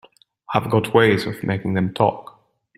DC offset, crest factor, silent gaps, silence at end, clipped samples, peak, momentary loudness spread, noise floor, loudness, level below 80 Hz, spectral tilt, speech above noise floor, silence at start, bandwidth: under 0.1%; 20 dB; none; 0.55 s; under 0.1%; 0 dBFS; 8 LU; -38 dBFS; -20 LUFS; -54 dBFS; -7 dB/octave; 19 dB; 0.5 s; 15 kHz